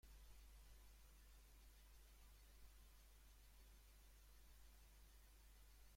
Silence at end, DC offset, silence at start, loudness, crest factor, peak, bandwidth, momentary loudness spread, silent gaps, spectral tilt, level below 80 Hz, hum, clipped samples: 0 s; under 0.1%; 0.05 s; -69 LUFS; 14 dB; -52 dBFS; 16.5 kHz; 2 LU; none; -3 dB/octave; -68 dBFS; none; under 0.1%